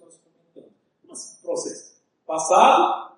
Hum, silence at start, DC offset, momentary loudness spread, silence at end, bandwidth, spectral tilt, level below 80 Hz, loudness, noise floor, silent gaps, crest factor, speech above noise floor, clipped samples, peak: none; 1.15 s; under 0.1%; 24 LU; 0.1 s; 11 kHz; -2 dB/octave; -82 dBFS; -19 LUFS; -57 dBFS; none; 20 dB; 39 dB; under 0.1%; -2 dBFS